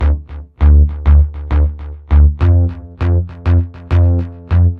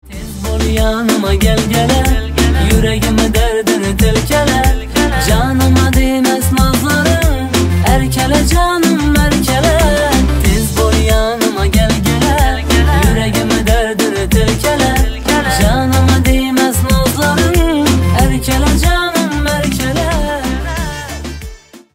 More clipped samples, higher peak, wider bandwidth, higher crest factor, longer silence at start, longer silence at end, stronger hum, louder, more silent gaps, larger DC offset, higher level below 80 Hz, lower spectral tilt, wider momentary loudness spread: neither; about the same, -2 dBFS vs 0 dBFS; second, 3.9 kHz vs 16.5 kHz; about the same, 10 dB vs 12 dB; about the same, 0 s vs 0.05 s; second, 0 s vs 0.15 s; neither; about the same, -14 LUFS vs -12 LUFS; neither; neither; about the same, -16 dBFS vs -16 dBFS; first, -10.5 dB/octave vs -5 dB/octave; first, 9 LU vs 4 LU